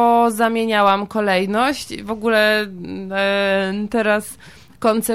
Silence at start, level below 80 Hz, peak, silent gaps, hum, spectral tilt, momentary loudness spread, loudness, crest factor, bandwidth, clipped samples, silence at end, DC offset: 0 s; -52 dBFS; -4 dBFS; none; none; -4 dB/octave; 11 LU; -18 LUFS; 14 dB; 16.5 kHz; under 0.1%; 0 s; 0.3%